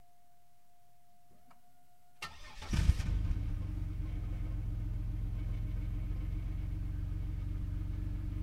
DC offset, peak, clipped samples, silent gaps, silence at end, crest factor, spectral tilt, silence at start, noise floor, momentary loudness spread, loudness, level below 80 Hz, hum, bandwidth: 0.2%; -14 dBFS; under 0.1%; none; 0 s; 22 dB; -6.5 dB/octave; 2.2 s; -70 dBFS; 7 LU; -39 LUFS; -38 dBFS; none; 12.5 kHz